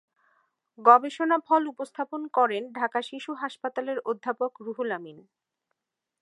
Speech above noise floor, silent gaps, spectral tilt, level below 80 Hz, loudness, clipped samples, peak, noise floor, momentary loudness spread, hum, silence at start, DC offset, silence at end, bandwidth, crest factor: 56 dB; none; -4.5 dB/octave; -90 dBFS; -26 LUFS; under 0.1%; -2 dBFS; -82 dBFS; 15 LU; none; 0.8 s; under 0.1%; 1 s; 11.5 kHz; 24 dB